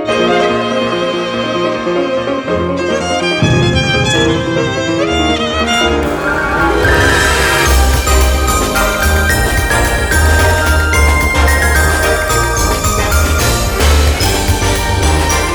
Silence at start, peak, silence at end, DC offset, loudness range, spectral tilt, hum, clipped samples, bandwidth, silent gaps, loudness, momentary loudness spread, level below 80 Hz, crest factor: 0 s; 0 dBFS; 0 s; under 0.1%; 2 LU; -4 dB/octave; none; under 0.1%; over 20 kHz; none; -12 LUFS; 5 LU; -18 dBFS; 12 dB